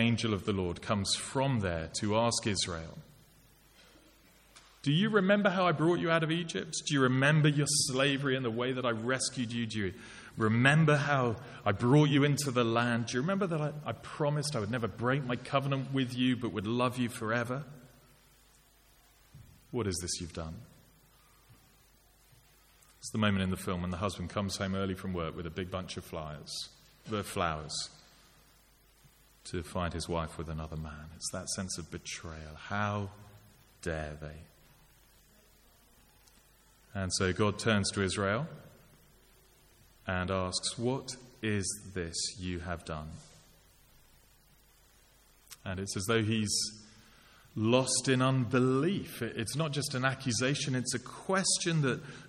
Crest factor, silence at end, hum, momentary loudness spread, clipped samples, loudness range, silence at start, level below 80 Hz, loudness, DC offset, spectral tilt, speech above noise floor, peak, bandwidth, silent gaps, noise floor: 24 dB; 0 s; none; 15 LU; under 0.1%; 12 LU; 0 s; -58 dBFS; -32 LUFS; under 0.1%; -4.5 dB/octave; 32 dB; -10 dBFS; 16 kHz; none; -64 dBFS